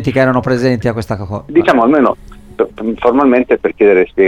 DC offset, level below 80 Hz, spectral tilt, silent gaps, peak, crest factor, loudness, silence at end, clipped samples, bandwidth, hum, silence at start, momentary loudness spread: under 0.1%; -40 dBFS; -7.5 dB/octave; none; 0 dBFS; 12 dB; -12 LUFS; 0 s; under 0.1%; 11.5 kHz; none; 0 s; 10 LU